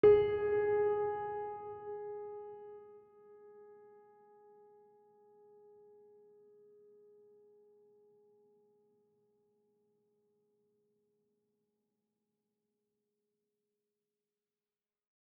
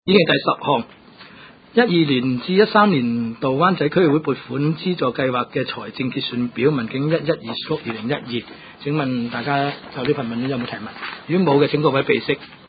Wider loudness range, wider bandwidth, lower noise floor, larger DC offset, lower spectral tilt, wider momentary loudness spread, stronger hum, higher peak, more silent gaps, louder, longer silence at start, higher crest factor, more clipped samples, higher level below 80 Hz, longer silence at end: first, 26 LU vs 6 LU; second, 3.2 kHz vs 5 kHz; first, under -90 dBFS vs -44 dBFS; neither; second, -5 dB/octave vs -11.5 dB/octave; first, 27 LU vs 10 LU; neither; second, -16 dBFS vs 0 dBFS; neither; second, -35 LUFS vs -20 LUFS; about the same, 0.05 s vs 0.05 s; about the same, 24 dB vs 20 dB; neither; second, -70 dBFS vs -58 dBFS; first, 11.65 s vs 0.15 s